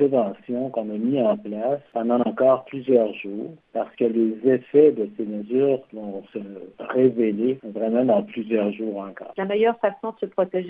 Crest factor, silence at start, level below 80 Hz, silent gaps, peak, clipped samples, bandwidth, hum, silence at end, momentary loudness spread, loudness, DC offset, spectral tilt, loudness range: 18 dB; 0 s; -72 dBFS; none; -4 dBFS; under 0.1%; 3.9 kHz; none; 0 s; 14 LU; -23 LUFS; under 0.1%; -10.5 dB/octave; 2 LU